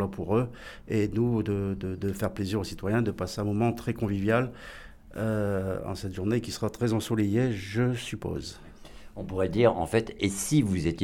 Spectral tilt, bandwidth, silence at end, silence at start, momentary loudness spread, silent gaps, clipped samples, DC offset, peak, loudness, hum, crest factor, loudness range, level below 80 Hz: -6 dB/octave; 17 kHz; 0 s; 0 s; 11 LU; none; under 0.1%; under 0.1%; -10 dBFS; -29 LUFS; none; 18 dB; 2 LU; -48 dBFS